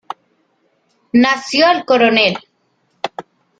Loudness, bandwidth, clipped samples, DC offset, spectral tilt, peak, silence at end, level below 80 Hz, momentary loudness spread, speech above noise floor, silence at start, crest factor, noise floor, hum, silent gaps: -13 LUFS; 9 kHz; under 0.1%; under 0.1%; -4 dB/octave; 0 dBFS; 0.4 s; -60 dBFS; 20 LU; 50 dB; 1.15 s; 16 dB; -63 dBFS; none; none